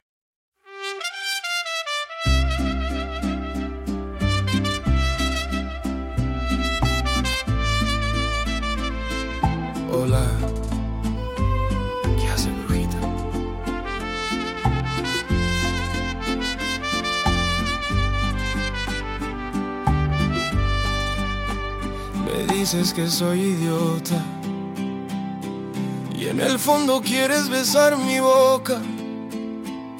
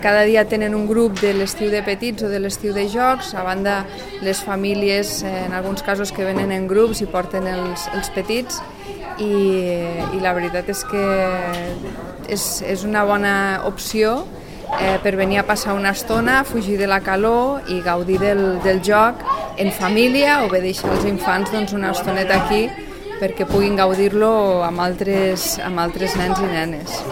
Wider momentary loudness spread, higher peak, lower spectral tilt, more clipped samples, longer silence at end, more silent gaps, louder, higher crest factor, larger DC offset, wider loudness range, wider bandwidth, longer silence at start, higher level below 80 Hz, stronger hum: about the same, 9 LU vs 9 LU; about the same, -4 dBFS vs -2 dBFS; about the same, -4.5 dB/octave vs -4.5 dB/octave; neither; about the same, 0 s vs 0 s; neither; second, -23 LUFS vs -19 LUFS; about the same, 20 dB vs 18 dB; second, under 0.1% vs 0.4%; about the same, 5 LU vs 4 LU; about the same, 17 kHz vs 16.5 kHz; first, 0.65 s vs 0 s; first, -30 dBFS vs -38 dBFS; neither